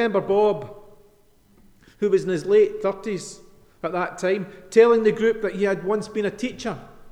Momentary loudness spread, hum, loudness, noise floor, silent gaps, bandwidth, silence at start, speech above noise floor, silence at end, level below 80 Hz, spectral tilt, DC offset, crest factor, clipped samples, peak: 15 LU; none; -22 LUFS; -56 dBFS; none; 10.5 kHz; 0 s; 35 dB; 0 s; -56 dBFS; -5.5 dB/octave; under 0.1%; 20 dB; under 0.1%; -4 dBFS